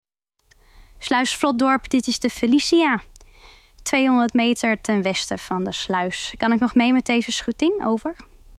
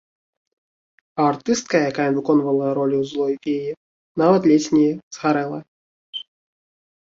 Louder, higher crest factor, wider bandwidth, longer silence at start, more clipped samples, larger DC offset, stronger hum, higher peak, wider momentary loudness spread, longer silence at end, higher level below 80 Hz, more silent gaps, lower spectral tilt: about the same, -20 LUFS vs -20 LUFS; about the same, 18 dB vs 16 dB; first, 14 kHz vs 7.8 kHz; second, 0.8 s vs 1.15 s; neither; neither; neither; about the same, -2 dBFS vs -4 dBFS; second, 8 LU vs 17 LU; second, 0.35 s vs 0.8 s; first, -50 dBFS vs -64 dBFS; second, none vs 3.77-4.15 s, 5.03-5.11 s, 5.68-6.13 s; second, -4 dB/octave vs -5.5 dB/octave